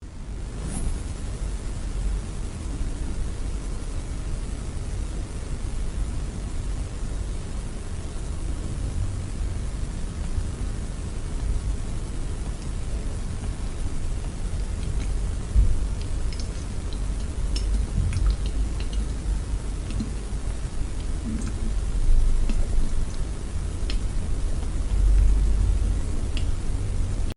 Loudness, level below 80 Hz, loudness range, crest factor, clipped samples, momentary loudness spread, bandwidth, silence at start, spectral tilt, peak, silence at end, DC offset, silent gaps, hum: -30 LUFS; -26 dBFS; 6 LU; 16 dB; under 0.1%; 8 LU; 11.5 kHz; 0 s; -6 dB/octave; -8 dBFS; 0.05 s; under 0.1%; none; none